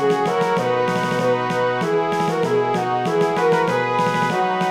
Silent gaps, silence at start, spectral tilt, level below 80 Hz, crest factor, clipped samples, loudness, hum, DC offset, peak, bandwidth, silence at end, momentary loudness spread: none; 0 s; -5.5 dB/octave; -66 dBFS; 12 dB; under 0.1%; -19 LUFS; none; under 0.1%; -6 dBFS; 15 kHz; 0 s; 2 LU